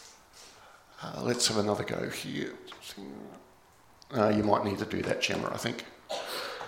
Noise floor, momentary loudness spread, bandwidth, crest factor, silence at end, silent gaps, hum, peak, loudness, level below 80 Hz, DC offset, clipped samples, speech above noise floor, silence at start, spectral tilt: -60 dBFS; 22 LU; 17 kHz; 24 dB; 0 s; none; none; -8 dBFS; -31 LUFS; -66 dBFS; under 0.1%; under 0.1%; 29 dB; 0 s; -4 dB/octave